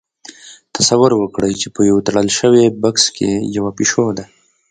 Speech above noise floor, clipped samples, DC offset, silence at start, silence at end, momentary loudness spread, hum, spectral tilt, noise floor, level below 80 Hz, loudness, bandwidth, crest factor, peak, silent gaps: 25 dB; under 0.1%; under 0.1%; 0.45 s; 0.45 s; 9 LU; none; -4 dB/octave; -39 dBFS; -50 dBFS; -14 LUFS; 9.6 kHz; 16 dB; 0 dBFS; none